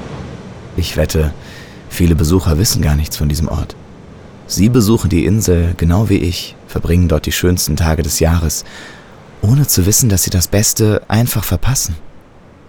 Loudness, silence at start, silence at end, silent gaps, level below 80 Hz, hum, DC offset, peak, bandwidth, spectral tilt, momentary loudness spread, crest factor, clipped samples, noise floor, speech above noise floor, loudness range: -14 LUFS; 0 s; 0.5 s; none; -26 dBFS; none; 0.6%; 0 dBFS; over 20 kHz; -5 dB/octave; 16 LU; 14 dB; under 0.1%; -41 dBFS; 27 dB; 3 LU